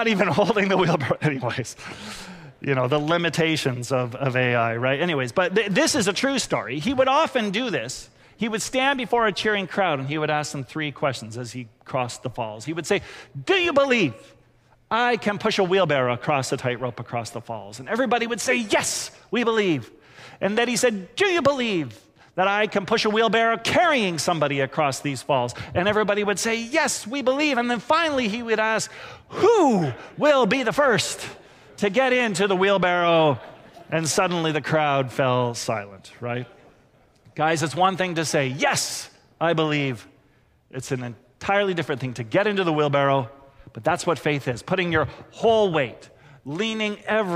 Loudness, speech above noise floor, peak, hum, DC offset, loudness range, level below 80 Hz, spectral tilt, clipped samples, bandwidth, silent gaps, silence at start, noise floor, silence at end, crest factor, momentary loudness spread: -22 LUFS; 37 dB; -8 dBFS; none; under 0.1%; 4 LU; -58 dBFS; -4.5 dB/octave; under 0.1%; 16 kHz; none; 0 s; -60 dBFS; 0 s; 16 dB; 12 LU